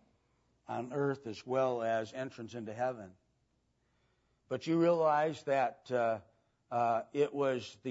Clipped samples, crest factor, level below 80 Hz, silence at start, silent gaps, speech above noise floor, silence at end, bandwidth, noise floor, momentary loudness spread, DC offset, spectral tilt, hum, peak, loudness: under 0.1%; 16 dB; -80 dBFS; 0.7 s; none; 43 dB; 0 s; 7.6 kHz; -77 dBFS; 13 LU; under 0.1%; -5 dB/octave; none; -18 dBFS; -34 LUFS